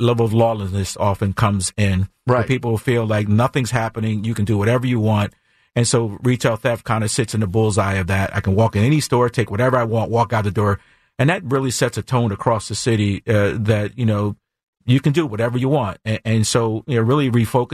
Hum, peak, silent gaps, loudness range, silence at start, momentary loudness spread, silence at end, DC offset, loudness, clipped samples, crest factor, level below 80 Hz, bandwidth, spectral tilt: none; -4 dBFS; 14.63-14.73 s; 2 LU; 0 s; 5 LU; 0 s; under 0.1%; -19 LUFS; under 0.1%; 14 dB; -46 dBFS; 14 kHz; -6 dB/octave